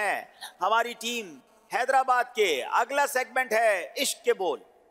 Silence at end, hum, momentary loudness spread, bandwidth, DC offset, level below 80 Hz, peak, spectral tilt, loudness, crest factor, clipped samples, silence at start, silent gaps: 0.3 s; none; 9 LU; 16 kHz; under 0.1%; -82 dBFS; -12 dBFS; -0.5 dB/octave; -26 LUFS; 16 dB; under 0.1%; 0 s; none